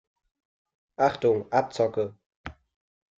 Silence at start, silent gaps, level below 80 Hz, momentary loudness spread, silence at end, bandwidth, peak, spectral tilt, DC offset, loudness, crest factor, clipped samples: 1 s; 2.26-2.30 s, 2.36-2.44 s; -60 dBFS; 21 LU; 0.65 s; 7.8 kHz; -8 dBFS; -6 dB/octave; under 0.1%; -26 LUFS; 22 dB; under 0.1%